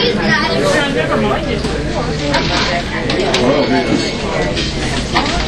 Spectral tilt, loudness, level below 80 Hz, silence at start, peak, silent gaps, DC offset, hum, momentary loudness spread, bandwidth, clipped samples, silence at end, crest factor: -4.5 dB/octave; -15 LUFS; -26 dBFS; 0 s; 0 dBFS; none; under 0.1%; none; 5 LU; 13.5 kHz; under 0.1%; 0 s; 14 dB